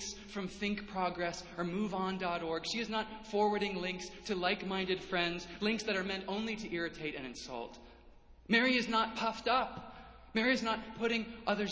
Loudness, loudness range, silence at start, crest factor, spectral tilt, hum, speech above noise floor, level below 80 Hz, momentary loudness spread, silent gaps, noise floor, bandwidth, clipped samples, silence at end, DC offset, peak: -35 LUFS; 4 LU; 0 s; 20 dB; -4 dB/octave; none; 23 dB; -62 dBFS; 11 LU; none; -58 dBFS; 8 kHz; under 0.1%; 0 s; under 0.1%; -16 dBFS